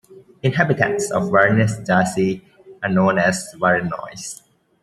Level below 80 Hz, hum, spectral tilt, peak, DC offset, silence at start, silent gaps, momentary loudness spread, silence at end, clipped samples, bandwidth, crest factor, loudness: -56 dBFS; none; -5.5 dB/octave; 0 dBFS; under 0.1%; 0.1 s; none; 15 LU; 0.45 s; under 0.1%; 13 kHz; 20 dB; -19 LUFS